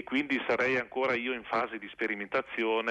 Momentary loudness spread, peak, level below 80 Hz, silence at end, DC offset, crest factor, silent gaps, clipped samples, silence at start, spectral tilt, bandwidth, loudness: 6 LU; -18 dBFS; -70 dBFS; 0 s; under 0.1%; 12 dB; none; under 0.1%; 0 s; -5 dB/octave; 9.4 kHz; -31 LUFS